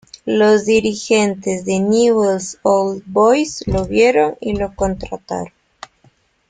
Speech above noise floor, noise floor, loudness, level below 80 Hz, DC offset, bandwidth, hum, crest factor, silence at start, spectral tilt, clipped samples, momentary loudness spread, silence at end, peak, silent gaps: 40 dB; -55 dBFS; -16 LUFS; -40 dBFS; under 0.1%; 9.4 kHz; none; 16 dB; 0.25 s; -5 dB/octave; under 0.1%; 11 LU; 1 s; -2 dBFS; none